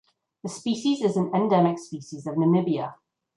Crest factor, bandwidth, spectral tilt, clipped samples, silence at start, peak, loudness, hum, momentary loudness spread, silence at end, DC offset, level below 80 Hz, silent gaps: 18 dB; 11.5 kHz; -7 dB/octave; under 0.1%; 0.45 s; -8 dBFS; -24 LUFS; none; 15 LU; 0.4 s; under 0.1%; -72 dBFS; none